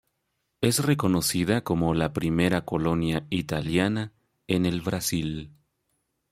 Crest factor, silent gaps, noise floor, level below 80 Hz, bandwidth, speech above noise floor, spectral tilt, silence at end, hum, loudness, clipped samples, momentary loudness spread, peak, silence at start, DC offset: 18 dB; none; -77 dBFS; -50 dBFS; 16 kHz; 52 dB; -5 dB/octave; 0.85 s; none; -26 LUFS; under 0.1%; 6 LU; -8 dBFS; 0.6 s; under 0.1%